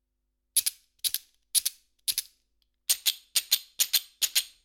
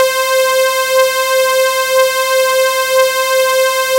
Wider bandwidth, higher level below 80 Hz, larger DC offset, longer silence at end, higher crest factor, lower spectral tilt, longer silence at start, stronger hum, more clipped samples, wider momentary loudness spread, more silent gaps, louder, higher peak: first, 19 kHz vs 16 kHz; second, -74 dBFS vs -58 dBFS; neither; first, 0.15 s vs 0 s; first, 26 dB vs 10 dB; second, 5 dB/octave vs 2 dB/octave; first, 0.55 s vs 0 s; neither; neither; first, 8 LU vs 1 LU; neither; second, -27 LUFS vs -12 LUFS; second, -6 dBFS vs -2 dBFS